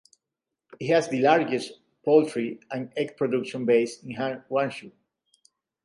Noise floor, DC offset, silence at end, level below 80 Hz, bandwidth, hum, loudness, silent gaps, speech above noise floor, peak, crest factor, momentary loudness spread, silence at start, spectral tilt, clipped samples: -86 dBFS; under 0.1%; 0.95 s; -76 dBFS; 11 kHz; none; -25 LUFS; none; 62 dB; -6 dBFS; 20 dB; 12 LU; 0.7 s; -5.5 dB/octave; under 0.1%